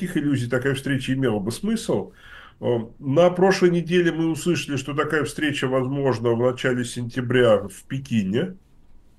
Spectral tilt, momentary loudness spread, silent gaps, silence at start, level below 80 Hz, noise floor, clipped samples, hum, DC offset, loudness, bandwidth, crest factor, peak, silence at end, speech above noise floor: -6 dB/octave; 8 LU; none; 0 s; -50 dBFS; -49 dBFS; under 0.1%; none; under 0.1%; -22 LUFS; 12.5 kHz; 18 dB; -4 dBFS; 0.6 s; 27 dB